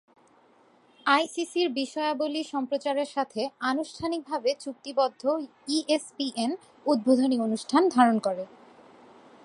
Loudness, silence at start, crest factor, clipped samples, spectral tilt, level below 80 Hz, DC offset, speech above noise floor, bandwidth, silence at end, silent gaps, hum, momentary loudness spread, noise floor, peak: -27 LUFS; 1.05 s; 22 dB; under 0.1%; -4 dB/octave; -74 dBFS; under 0.1%; 34 dB; 11.5 kHz; 1 s; none; none; 9 LU; -60 dBFS; -6 dBFS